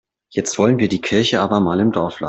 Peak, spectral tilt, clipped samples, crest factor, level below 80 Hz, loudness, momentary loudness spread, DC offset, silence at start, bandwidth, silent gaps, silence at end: -2 dBFS; -5 dB/octave; under 0.1%; 14 dB; -52 dBFS; -17 LUFS; 7 LU; under 0.1%; 0.35 s; 8.2 kHz; none; 0 s